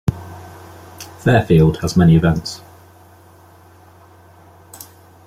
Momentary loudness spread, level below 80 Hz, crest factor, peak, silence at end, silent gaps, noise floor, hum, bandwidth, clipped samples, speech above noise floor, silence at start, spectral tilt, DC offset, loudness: 26 LU; -40 dBFS; 16 dB; -2 dBFS; 2.7 s; none; -46 dBFS; none; 15 kHz; under 0.1%; 32 dB; 0.05 s; -7 dB/octave; under 0.1%; -15 LUFS